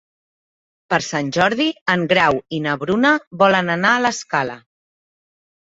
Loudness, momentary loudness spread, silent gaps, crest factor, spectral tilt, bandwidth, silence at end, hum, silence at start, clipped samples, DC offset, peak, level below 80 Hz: -18 LUFS; 7 LU; 1.81-1.86 s, 3.27-3.31 s; 18 dB; -4.5 dB/octave; 8 kHz; 1.1 s; none; 0.9 s; under 0.1%; under 0.1%; -2 dBFS; -56 dBFS